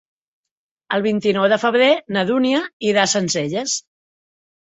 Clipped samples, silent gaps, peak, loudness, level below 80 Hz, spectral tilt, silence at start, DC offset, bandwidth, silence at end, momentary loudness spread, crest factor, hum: under 0.1%; 2.73-2.80 s; -2 dBFS; -18 LUFS; -64 dBFS; -3.5 dB/octave; 0.9 s; under 0.1%; 8.4 kHz; 0.95 s; 7 LU; 18 dB; none